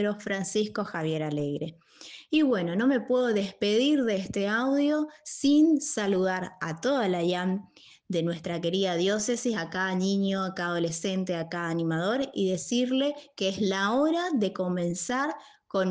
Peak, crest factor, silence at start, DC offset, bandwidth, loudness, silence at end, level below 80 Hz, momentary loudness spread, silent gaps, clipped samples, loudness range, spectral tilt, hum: -14 dBFS; 14 dB; 0 s; under 0.1%; 9.8 kHz; -28 LUFS; 0 s; -68 dBFS; 7 LU; none; under 0.1%; 3 LU; -5 dB/octave; none